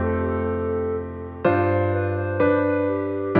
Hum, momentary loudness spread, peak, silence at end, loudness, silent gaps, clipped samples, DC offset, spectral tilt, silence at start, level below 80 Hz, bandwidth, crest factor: none; 6 LU; -4 dBFS; 0 s; -23 LUFS; none; under 0.1%; under 0.1%; -11.5 dB/octave; 0 s; -44 dBFS; 4.6 kHz; 18 dB